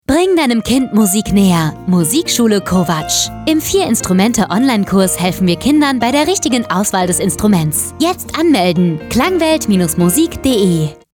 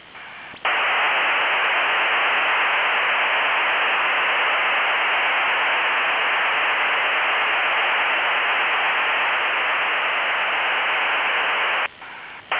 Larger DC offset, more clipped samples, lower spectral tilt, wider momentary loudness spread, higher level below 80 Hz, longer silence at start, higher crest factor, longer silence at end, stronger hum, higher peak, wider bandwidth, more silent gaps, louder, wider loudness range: neither; neither; first, -4.5 dB/octave vs 3.5 dB/octave; about the same, 3 LU vs 2 LU; first, -38 dBFS vs -66 dBFS; about the same, 0.1 s vs 0.05 s; about the same, 10 dB vs 10 dB; first, 0.2 s vs 0 s; neither; first, -2 dBFS vs -12 dBFS; first, 19 kHz vs 4 kHz; neither; first, -13 LUFS vs -18 LUFS; about the same, 1 LU vs 1 LU